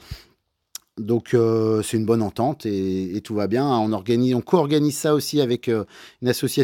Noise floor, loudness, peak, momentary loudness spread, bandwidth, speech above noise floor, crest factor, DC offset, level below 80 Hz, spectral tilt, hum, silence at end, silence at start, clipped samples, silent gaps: -64 dBFS; -22 LUFS; -2 dBFS; 14 LU; 17 kHz; 44 dB; 18 dB; under 0.1%; -54 dBFS; -6 dB/octave; none; 0 s; 0.1 s; under 0.1%; none